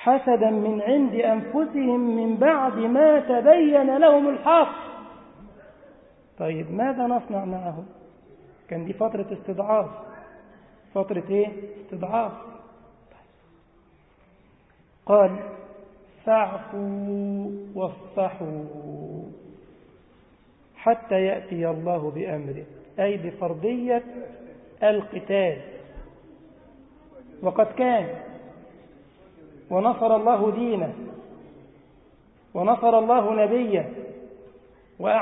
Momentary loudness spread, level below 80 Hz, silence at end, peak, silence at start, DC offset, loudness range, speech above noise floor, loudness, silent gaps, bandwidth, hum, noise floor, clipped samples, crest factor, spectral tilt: 21 LU; -60 dBFS; 0 s; -4 dBFS; 0 s; under 0.1%; 11 LU; 36 dB; -23 LUFS; none; 4 kHz; none; -58 dBFS; under 0.1%; 20 dB; -11 dB/octave